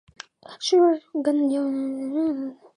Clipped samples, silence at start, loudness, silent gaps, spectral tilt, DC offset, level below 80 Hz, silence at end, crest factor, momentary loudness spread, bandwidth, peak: under 0.1%; 0.5 s; -23 LUFS; none; -3.5 dB/octave; under 0.1%; -72 dBFS; 0.2 s; 14 dB; 20 LU; 10.5 kHz; -10 dBFS